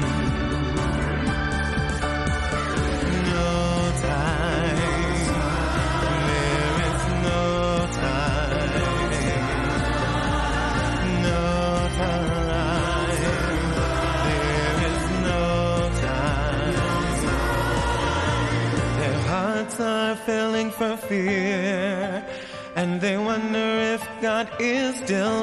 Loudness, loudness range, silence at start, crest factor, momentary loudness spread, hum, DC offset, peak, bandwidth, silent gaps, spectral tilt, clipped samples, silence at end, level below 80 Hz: -24 LUFS; 2 LU; 0 s; 12 dB; 2 LU; none; under 0.1%; -12 dBFS; 13 kHz; none; -5.5 dB/octave; under 0.1%; 0 s; -32 dBFS